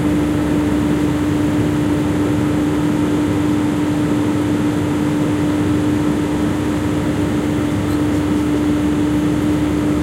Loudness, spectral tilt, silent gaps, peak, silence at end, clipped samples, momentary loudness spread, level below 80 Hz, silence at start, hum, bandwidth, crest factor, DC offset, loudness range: -17 LUFS; -7 dB/octave; none; -6 dBFS; 0 s; under 0.1%; 2 LU; -34 dBFS; 0 s; none; 15.5 kHz; 12 dB; under 0.1%; 1 LU